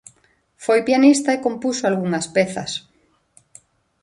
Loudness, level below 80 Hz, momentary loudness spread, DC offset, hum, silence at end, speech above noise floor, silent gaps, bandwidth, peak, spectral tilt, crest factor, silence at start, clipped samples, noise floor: -19 LUFS; -64 dBFS; 14 LU; under 0.1%; none; 1.25 s; 42 dB; none; 11.5 kHz; -2 dBFS; -4.5 dB/octave; 18 dB; 0.6 s; under 0.1%; -60 dBFS